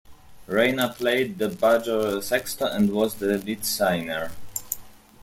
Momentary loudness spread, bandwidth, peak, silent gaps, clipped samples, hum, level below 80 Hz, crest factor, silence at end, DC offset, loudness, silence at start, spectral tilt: 10 LU; 16.5 kHz; -4 dBFS; none; under 0.1%; none; -56 dBFS; 20 dB; 0 s; under 0.1%; -24 LUFS; 0.1 s; -4 dB/octave